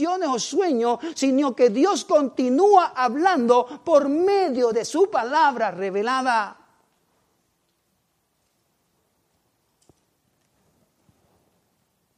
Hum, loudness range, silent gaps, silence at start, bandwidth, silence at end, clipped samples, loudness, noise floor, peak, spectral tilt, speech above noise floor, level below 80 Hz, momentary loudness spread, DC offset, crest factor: none; 10 LU; none; 0 s; 12 kHz; 5.65 s; under 0.1%; -20 LUFS; -71 dBFS; -4 dBFS; -3.5 dB/octave; 50 dB; -74 dBFS; 6 LU; under 0.1%; 18 dB